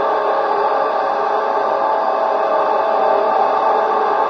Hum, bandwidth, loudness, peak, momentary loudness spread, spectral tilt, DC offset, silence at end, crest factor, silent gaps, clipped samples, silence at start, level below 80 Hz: none; 6.6 kHz; -16 LUFS; -4 dBFS; 2 LU; -4.5 dB/octave; under 0.1%; 0 s; 12 dB; none; under 0.1%; 0 s; -68 dBFS